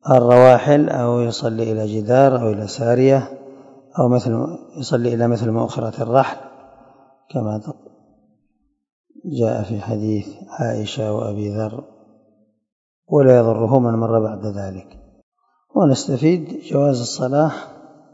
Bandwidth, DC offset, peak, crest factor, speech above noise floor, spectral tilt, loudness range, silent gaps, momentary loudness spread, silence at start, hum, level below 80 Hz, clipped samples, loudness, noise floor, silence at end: 8 kHz; under 0.1%; 0 dBFS; 18 dB; 50 dB; -7 dB/octave; 8 LU; 8.93-9.04 s, 12.72-13.02 s, 15.23-15.32 s; 16 LU; 0.05 s; none; -60 dBFS; under 0.1%; -18 LUFS; -67 dBFS; 0.4 s